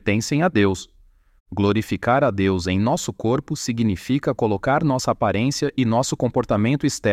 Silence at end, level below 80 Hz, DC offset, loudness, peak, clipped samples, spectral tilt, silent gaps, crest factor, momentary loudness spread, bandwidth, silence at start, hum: 0 s; -48 dBFS; under 0.1%; -21 LUFS; -6 dBFS; under 0.1%; -5.5 dB/octave; 1.40-1.46 s; 16 dB; 4 LU; 16 kHz; 0.05 s; none